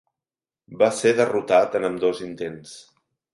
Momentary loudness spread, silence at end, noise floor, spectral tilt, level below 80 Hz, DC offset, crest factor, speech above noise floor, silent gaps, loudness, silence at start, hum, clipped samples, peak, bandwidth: 14 LU; 0.5 s; under -90 dBFS; -4.5 dB/octave; -64 dBFS; under 0.1%; 20 dB; over 69 dB; none; -21 LUFS; 0.7 s; none; under 0.1%; -4 dBFS; 11.5 kHz